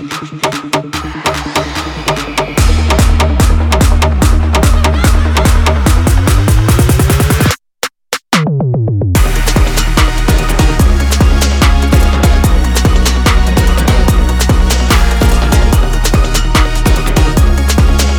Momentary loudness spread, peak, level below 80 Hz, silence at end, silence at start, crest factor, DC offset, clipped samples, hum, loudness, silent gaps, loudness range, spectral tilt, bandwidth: 6 LU; 0 dBFS; -10 dBFS; 0 s; 0 s; 8 dB; under 0.1%; under 0.1%; none; -11 LUFS; none; 2 LU; -5 dB/octave; 19.5 kHz